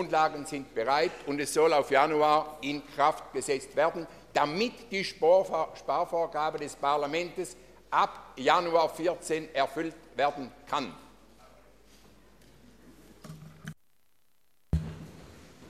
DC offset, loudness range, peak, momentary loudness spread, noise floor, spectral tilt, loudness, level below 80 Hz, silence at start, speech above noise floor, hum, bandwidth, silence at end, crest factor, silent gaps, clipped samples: under 0.1%; 15 LU; -8 dBFS; 17 LU; -74 dBFS; -4.5 dB/octave; -29 LUFS; -52 dBFS; 0 s; 46 dB; none; 15 kHz; 0 s; 22 dB; none; under 0.1%